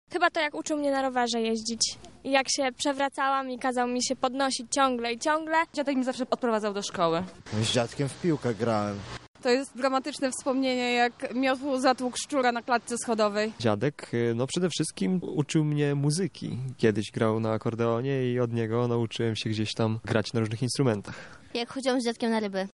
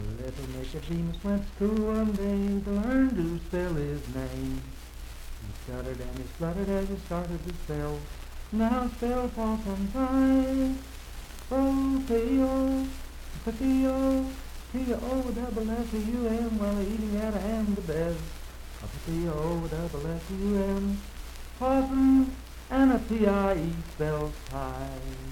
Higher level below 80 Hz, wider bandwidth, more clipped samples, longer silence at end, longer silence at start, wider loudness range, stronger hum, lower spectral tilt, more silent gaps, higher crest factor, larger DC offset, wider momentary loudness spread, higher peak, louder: second, -64 dBFS vs -38 dBFS; second, 11.5 kHz vs 16.5 kHz; neither; about the same, 0.05 s vs 0 s; about the same, 0.1 s vs 0 s; second, 2 LU vs 8 LU; neither; second, -4.5 dB/octave vs -7 dB/octave; first, 9.28-9.34 s vs none; about the same, 20 dB vs 18 dB; neither; second, 4 LU vs 16 LU; first, -8 dBFS vs -12 dBFS; about the same, -28 LUFS vs -29 LUFS